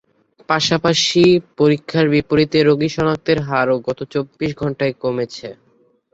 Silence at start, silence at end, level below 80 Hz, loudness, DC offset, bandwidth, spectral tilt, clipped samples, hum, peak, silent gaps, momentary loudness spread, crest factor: 0.5 s; 0.6 s; -50 dBFS; -17 LUFS; under 0.1%; 8 kHz; -5 dB/octave; under 0.1%; none; -2 dBFS; none; 10 LU; 16 dB